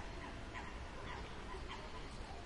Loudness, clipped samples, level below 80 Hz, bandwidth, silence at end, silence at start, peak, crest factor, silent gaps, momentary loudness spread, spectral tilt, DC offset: -49 LUFS; under 0.1%; -52 dBFS; 11.5 kHz; 0 s; 0 s; -34 dBFS; 14 dB; none; 2 LU; -4.5 dB/octave; under 0.1%